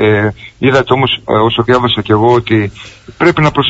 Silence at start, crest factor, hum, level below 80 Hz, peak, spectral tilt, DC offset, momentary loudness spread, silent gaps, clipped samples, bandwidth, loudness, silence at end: 0 s; 12 dB; none; -40 dBFS; 0 dBFS; -6.5 dB/octave; under 0.1%; 5 LU; none; under 0.1%; 8 kHz; -11 LUFS; 0 s